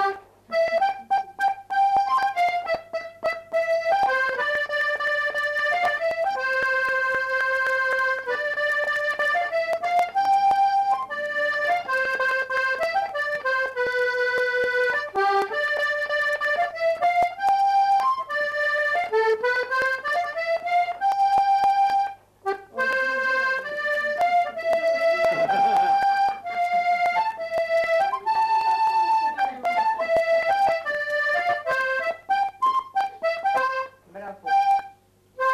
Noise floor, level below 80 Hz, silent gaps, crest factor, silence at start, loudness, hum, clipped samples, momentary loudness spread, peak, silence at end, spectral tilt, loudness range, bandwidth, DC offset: -54 dBFS; -64 dBFS; none; 10 dB; 0 s; -23 LUFS; none; under 0.1%; 6 LU; -12 dBFS; 0 s; -2.5 dB/octave; 2 LU; 14 kHz; under 0.1%